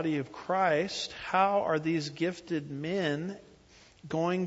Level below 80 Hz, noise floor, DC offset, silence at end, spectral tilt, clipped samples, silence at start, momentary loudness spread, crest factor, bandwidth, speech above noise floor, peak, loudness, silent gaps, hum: -66 dBFS; -58 dBFS; under 0.1%; 0 s; -5.5 dB/octave; under 0.1%; 0 s; 9 LU; 18 dB; 8 kHz; 28 dB; -12 dBFS; -31 LUFS; none; none